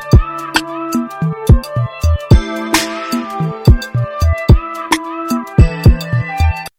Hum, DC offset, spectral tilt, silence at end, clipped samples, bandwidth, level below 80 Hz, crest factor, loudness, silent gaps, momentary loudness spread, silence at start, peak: none; under 0.1%; -6 dB/octave; 0.1 s; 0.2%; 16.5 kHz; -16 dBFS; 12 dB; -15 LUFS; none; 8 LU; 0 s; 0 dBFS